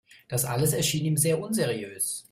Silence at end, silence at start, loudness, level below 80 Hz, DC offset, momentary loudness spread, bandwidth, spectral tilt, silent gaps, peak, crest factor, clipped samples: 0.1 s; 0.3 s; -26 LUFS; -58 dBFS; under 0.1%; 6 LU; 16 kHz; -4 dB/octave; none; -10 dBFS; 16 dB; under 0.1%